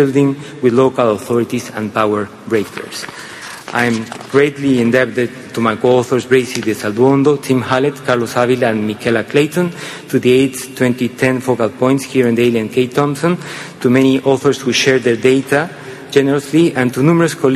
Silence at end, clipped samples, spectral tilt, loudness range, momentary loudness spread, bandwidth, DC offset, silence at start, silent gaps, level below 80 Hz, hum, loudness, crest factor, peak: 0 s; under 0.1%; -5.5 dB/octave; 3 LU; 8 LU; 14.5 kHz; under 0.1%; 0 s; none; -54 dBFS; none; -14 LUFS; 14 dB; 0 dBFS